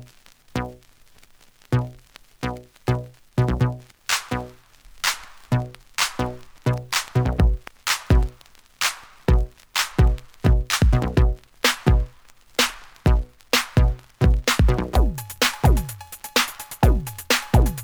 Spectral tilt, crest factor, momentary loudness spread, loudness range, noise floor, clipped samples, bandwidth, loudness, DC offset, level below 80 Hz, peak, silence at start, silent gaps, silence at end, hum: -4.5 dB/octave; 20 dB; 11 LU; 5 LU; -52 dBFS; under 0.1%; over 20 kHz; -23 LUFS; under 0.1%; -26 dBFS; -2 dBFS; 0 s; none; 0 s; none